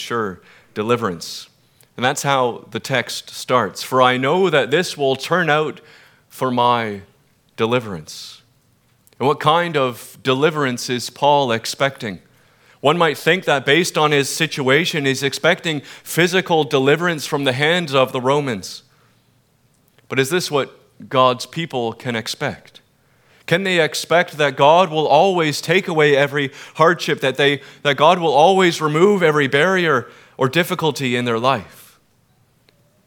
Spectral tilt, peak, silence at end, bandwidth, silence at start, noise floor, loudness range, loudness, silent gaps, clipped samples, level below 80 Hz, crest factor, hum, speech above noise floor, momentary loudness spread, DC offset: -4.5 dB/octave; 0 dBFS; 1.4 s; 19.5 kHz; 0 s; -59 dBFS; 6 LU; -17 LUFS; none; under 0.1%; -66 dBFS; 18 dB; none; 41 dB; 12 LU; under 0.1%